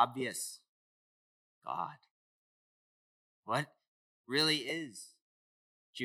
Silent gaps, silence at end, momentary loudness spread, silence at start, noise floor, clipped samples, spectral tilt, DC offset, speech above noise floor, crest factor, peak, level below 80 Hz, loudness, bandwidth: 0.68-1.61 s, 2.11-3.43 s, 3.87-4.24 s, 5.22-5.93 s; 0 s; 22 LU; 0 s; under -90 dBFS; under 0.1%; -3 dB/octave; under 0.1%; over 55 dB; 26 dB; -14 dBFS; under -90 dBFS; -35 LUFS; 16 kHz